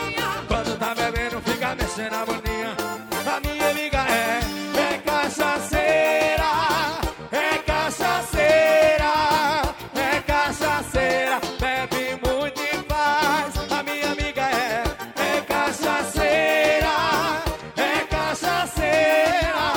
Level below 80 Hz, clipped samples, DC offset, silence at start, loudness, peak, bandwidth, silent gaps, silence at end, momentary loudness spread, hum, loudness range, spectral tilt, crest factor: -36 dBFS; under 0.1%; under 0.1%; 0 s; -22 LUFS; -6 dBFS; over 20 kHz; none; 0 s; 8 LU; none; 4 LU; -3.5 dB/octave; 16 dB